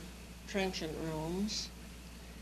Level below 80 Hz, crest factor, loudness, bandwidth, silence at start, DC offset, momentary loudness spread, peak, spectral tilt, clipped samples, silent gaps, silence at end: -52 dBFS; 20 dB; -38 LUFS; 13.5 kHz; 0 s; under 0.1%; 14 LU; -20 dBFS; -4 dB/octave; under 0.1%; none; 0 s